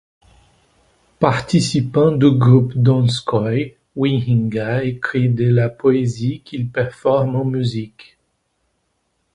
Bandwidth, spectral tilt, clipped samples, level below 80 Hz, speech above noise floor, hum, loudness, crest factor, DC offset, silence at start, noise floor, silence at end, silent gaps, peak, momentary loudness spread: 11 kHz; -7 dB/octave; under 0.1%; -50 dBFS; 52 dB; none; -17 LUFS; 18 dB; under 0.1%; 1.2 s; -68 dBFS; 1.45 s; none; 0 dBFS; 10 LU